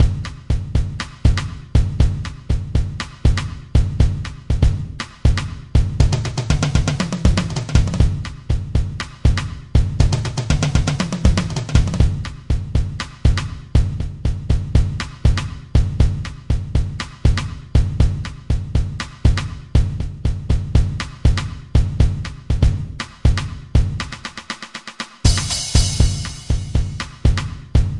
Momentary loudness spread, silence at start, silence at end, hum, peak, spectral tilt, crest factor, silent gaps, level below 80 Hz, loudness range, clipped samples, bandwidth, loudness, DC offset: 8 LU; 0 s; 0 s; none; 0 dBFS; -5.5 dB/octave; 18 dB; none; -20 dBFS; 2 LU; under 0.1%; 11.5 kHz; -20 LUFS; 0.2%